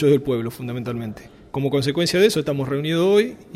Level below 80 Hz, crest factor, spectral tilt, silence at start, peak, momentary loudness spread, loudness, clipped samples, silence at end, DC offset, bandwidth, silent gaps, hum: -52 dBFS; 16 dB; -5.5 dB/octave; 0 s; -4 dBFS; 13 LU; -21 LUFS; under 0.1%; 0 s; under 0.1%; 15.5 kHz; none; none